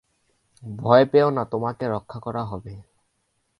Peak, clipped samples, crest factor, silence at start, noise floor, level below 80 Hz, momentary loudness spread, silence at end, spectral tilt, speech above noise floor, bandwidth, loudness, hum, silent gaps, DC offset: 0 dBFS; under 0.1%; 22 dB; 0.65 s; -72 dBFS; -56 dBFS; 22 LU; 0.8 s; -8.5 dB/octave; 50 dB; 10.5 kHz; -22 LUFS; none; none; under 0.1%